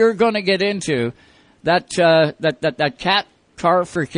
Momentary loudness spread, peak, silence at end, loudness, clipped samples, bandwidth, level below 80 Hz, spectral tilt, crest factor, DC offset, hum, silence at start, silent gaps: 7 LU; -2 dBFS; 0 s; -18 LUFS; under 0.1%; 10.5 kHz; -56 dBFS; -5 dB/octave; 16 dB; under 0.1%; none; 0 s; none